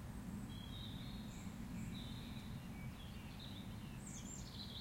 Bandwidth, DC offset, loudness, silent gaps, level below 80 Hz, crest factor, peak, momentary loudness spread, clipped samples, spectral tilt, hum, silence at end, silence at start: 16.5 kHz; under 0.1%; -50 LUFS; none; -58 dBFS; 12 dB; -36 dBFS; 3 LU; under 0.1%; -5 dB/octave; none; 0 s; 0 s